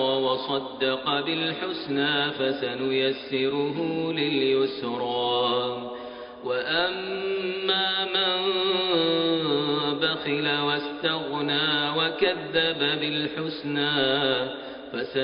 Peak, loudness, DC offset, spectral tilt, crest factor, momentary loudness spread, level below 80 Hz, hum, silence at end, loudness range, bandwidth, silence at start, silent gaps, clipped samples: -10 dBFS; -25 LUFS; under 0.1%; -1.5 dB/octave; 16 dB; 7 LU; -64 dBFS; none; 0 s; 2 LU; 5.2 kHz; 0 s; none; under 0.1%